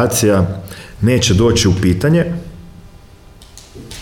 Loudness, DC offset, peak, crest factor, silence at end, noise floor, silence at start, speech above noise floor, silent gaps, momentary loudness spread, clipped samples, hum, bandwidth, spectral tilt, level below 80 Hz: -14 LUFS; under 0.1%; -2 dBFS; 14 dB; 0 s; -40 dBFS; 0 s; 27 dB; none; 21 LU; under 0.1%; none; 18.5 kHz; -5 dB/octave; -34 dBFS